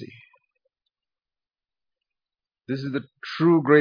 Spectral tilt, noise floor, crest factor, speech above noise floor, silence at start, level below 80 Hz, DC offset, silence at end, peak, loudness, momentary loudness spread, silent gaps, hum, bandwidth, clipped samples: -8.5 dB/octave; under -90 dBFS; 22 dB; over 69 dB; 0 s; -74 dBFS; under 0.1%; 0 s; -4 dBFS; -23 LUFS; 16 LU; none; none; 5.2 kHz; under 0.1%